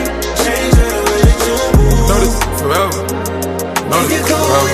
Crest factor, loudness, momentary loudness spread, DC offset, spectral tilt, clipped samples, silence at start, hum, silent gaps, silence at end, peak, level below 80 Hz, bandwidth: 12 dB; -13 LUFS; 7 LU; under 0.1%; -4.5 dB/octave; under 0.1%; 0 s; none; none; 0 s; 0 dBFS; -18 dBFS; 15.5 kHz